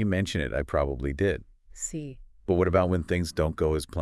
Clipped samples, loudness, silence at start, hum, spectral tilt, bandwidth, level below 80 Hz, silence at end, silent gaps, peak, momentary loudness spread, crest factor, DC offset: under 0.1%; -28 LUFS; 0 s; none; -6 dB/octave; 12 kHz; -40 dBFS; 0 s; none; -10 dBFS; 12 LU; 18 dB; under 0.1%